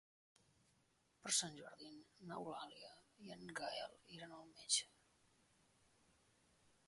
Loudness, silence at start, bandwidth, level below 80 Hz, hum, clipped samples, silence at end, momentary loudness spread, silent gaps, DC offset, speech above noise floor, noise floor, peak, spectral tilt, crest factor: -44 LUFS; 1.25 s; 11.5 kHz; -86 dBFS; none; under 0.1%; 2 s; 20 LU; none; under 0.1%; 31 dB; -79 dBFS; -20 dBFS; -1 dB/octave; 30 dB